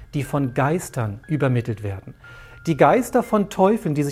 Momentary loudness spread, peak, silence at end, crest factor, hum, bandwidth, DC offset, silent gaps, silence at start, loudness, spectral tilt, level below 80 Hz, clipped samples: 13 LU; -2 dBFS; 0 s; 20 dB; none; 16 kHz; under 0.1%; none; 0 s; -21 LUFS; -7 dB/octave; -48 dBFS; under 0.1%